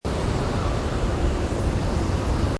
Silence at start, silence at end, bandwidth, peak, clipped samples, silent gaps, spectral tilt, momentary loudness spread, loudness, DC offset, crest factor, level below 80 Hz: 0.05 s; 0 s; 11 kHz; -12 dBFS; under 0.1%; none; -6.5 dB/octave; 1 LU; -25 LUFS; under 0.1%; 12 dB; -28 dBFS